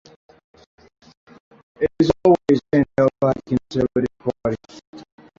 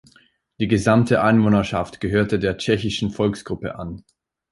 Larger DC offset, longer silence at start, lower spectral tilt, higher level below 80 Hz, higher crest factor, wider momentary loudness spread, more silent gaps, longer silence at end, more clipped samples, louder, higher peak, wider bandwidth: neither; first, 1.8 s vs 0.6 s; first, -8 dB/octave vs -6.5 dB/octave; about the same, -48 dBFS vs -44 dBFS; about the same, 18 dB vs 18 dB; second, 10 LU vs 13 LU; first, 4.87-4.93 s vs none; second, 0.35 s vs 0.5 s; neither; about the same, -20 LUFS vs -20 LUFS; about the same, -4 dBFS vs -2 dBFS; second, 7.6 kHz vs 11.5 kHz